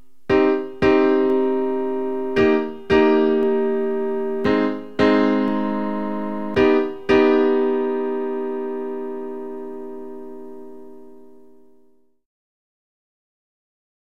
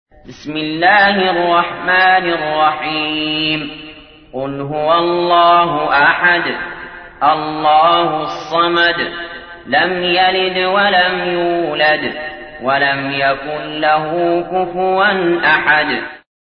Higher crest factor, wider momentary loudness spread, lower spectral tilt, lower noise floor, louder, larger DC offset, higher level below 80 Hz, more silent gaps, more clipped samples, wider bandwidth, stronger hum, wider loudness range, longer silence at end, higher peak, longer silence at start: about the same, 18 dB vs 14 dB; first, 16 LU vs 13 LU; about the same, -7 dB/octave vs -6 dB/octave; first, -58 dBFS vs -37 dBFS; second, -20 LUFS vs -14 LUFS; first, 1% vs under 0.1%; about the same, -50 dBFS vs -48 dBFS; neither; neither; about the same, 6.6 kHz vs 6.4 kHz; neither; first, 16 LU vs 3 LU; first, 1.8 s vs 0.25 s; second, -4 dBFS vs 0 dBFS; about the same, 0.3 s vs 0.3 s